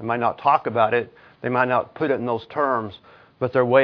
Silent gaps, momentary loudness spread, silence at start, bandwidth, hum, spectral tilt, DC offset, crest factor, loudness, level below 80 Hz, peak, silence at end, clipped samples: none; 9 LU; 0 s; 5.4 kHz; none; -9 dB/octave; under 0.1%; 20 dB; -22 LUFS; -64 dBFS; -2 dBFS; 0 s; under 0.1%